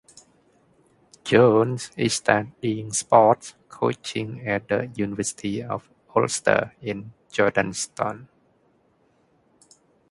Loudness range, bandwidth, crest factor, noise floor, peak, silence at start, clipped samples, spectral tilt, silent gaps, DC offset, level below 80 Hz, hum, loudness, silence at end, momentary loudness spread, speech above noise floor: 6 LU; 11.5 kHz; 24 dB; -63 dBFS; 0 dBFS; 1.25 s; under 0.1%; -4.5 dB/octave; none; under 0.1%; -60 dBFS; none; -23 LUFS; 1.85 s; 15 LU; 41 dB